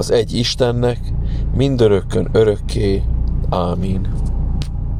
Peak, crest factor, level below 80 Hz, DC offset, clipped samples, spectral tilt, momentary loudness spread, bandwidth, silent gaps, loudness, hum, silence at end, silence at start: -2 dBFS; 14 dB; -22 dBFS; under 0.1%; under 0.1%; -6.5 dB/octave; 8 LU; 12.5 kHz; none; -18 LUFS; none; 0 s; 0 s